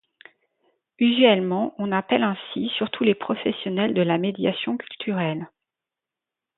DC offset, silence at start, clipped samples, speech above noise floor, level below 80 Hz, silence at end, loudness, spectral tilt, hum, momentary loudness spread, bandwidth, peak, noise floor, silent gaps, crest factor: under 0.1%; 1 s; under 0.1%; 65 dB; -68 dBFS; 1.1 s; -23 LUFS; -10.5 dB/octave; none; 11 LU; 4.1 kHz; -2 dBFS; -88 dBFS; none; 22 dB